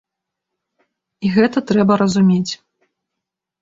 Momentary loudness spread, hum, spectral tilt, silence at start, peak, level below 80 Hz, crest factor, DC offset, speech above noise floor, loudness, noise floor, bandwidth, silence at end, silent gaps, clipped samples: 11 LU; none; -6.5 dB/octave; 1.2 s; -2 dBFS; -56 dBFS; 16 dB; under 0.1%; 67 dB; -16 LUFS; -82 dBFS; 7.8 kHz; 1.05 s; none; under 0.1%